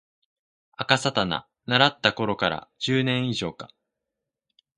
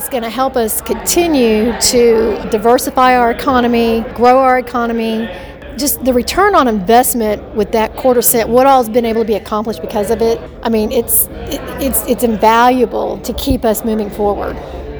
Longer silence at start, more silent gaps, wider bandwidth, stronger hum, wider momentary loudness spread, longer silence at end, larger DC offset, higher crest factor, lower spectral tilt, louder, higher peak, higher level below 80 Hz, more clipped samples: first, 0.8 s vs 0 s; neither; second, 11.5 kHz vs over 20 kHz; neither; first, 13 LU vs 9 LU; first, 1.1 s vs 0 s; neither; first, 26 dB vs 12 dB; about the same, -4.5 dB/octave vs -3.5 dB/octave; second, -24 LUFS vs -13 LUFS; about the same, 0 dBFS vs 0 dBFS; second, -60 dBFS vs -32 dBFS; second, under 0.1% vs 0.2%